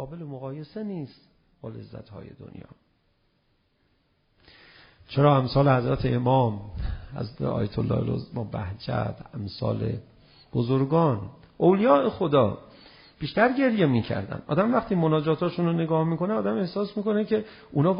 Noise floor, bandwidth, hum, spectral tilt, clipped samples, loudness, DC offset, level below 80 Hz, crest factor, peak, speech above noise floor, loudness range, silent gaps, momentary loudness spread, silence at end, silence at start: -69 dBFS; 5.2 kHz; none; -7 dB/octave; under 0.1%; -25 LUFS; under 0.1%; -48 dBFS; 20 dB; -6 dBFS; 44 dB; 7 LU; none; 18 LU; 0 s; 0 s